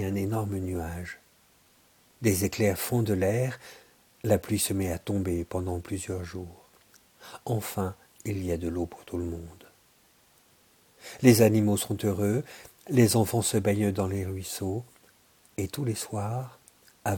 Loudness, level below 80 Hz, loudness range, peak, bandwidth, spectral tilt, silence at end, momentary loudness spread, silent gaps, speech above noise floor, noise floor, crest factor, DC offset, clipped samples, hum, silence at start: -28 LUFS; -54 dBFS; 10 LU; -4 dBFS; 19 kHz; -5.5 dB/octave; 0 s; 19 LU; none; 35 dB; -62 dBFS; 24 dB; under 0.1%; under 0.1%; none; 0 s